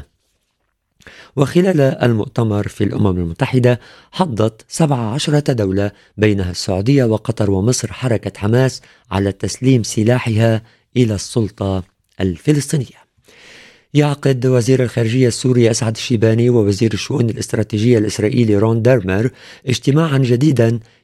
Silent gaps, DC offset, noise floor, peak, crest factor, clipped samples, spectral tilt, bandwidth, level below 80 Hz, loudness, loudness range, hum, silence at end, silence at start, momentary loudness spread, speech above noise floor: none; under 0.1%; -68 dBFS; 0 dBFS; 16 dB; under 0.1%; -6.5 dB/octave; 13 kHz; -48 dBFS; -16 LUFS; 3 LU; none; 0.2 s; 0 s; 7 LU; 53 dB